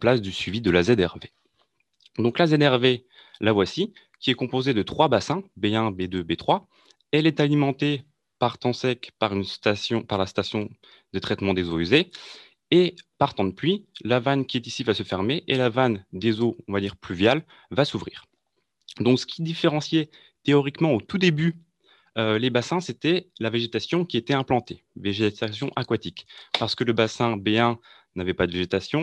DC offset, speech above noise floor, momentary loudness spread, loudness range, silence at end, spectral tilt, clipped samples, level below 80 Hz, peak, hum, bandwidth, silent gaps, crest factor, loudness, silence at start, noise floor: under 0.1%; 51 dB; 9 LU; 3 LU; 0 s; -6 dB/octave; under 0.1%; -60 dBFS; -4 dBFS; none; 10 kHz; none; 20 dB; -24 LUFS; 0 s; -75 dBFS